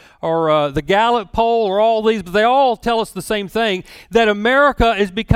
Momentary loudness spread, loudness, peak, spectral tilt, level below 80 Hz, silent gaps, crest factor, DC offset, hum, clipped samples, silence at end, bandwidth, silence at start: 7 LU; -16 LUFS; 0 dBFS; -5.5 dB/octave; -36 dBFS; none; 16 dB; under 0.1%; none; under 0.1%; 0 s; 16 kHz; 0.25 s